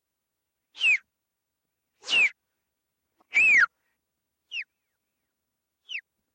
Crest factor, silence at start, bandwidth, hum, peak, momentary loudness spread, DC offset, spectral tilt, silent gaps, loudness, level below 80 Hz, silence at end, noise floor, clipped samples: 18 dB; 0.8 s; 9.6 kHz; none; -12 dBFS; 19 LU; under 0.1%; 1.5 dB/octave; none; -21 LUFS; -78 dBFS; 0.35 s; -84 dBFS; under 0.1%